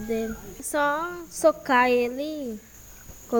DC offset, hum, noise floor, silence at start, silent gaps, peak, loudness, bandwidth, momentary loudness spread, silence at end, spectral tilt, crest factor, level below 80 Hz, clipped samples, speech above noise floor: under 0.1%; none; -45 dBFS; 0 s; none; -8 dBFS; -25 LUFS; 19.5 kHz; 21 LU; 0 s; -3.5 dB/octave; 18 dB; -52 dBFS; under 0.1%; 20 dB